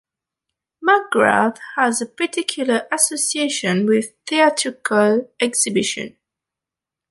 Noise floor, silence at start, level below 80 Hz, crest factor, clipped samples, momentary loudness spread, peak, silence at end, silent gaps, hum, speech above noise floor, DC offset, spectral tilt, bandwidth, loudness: -87 dBFS; 0.8 s; -68 dBFS; 18 dB; under 0.1%; 6 LU; 0 dBFS; 1 s; none; none; 69 dB; under 0.1%; -3 dB/octave; 12 kHz; -18 LUFS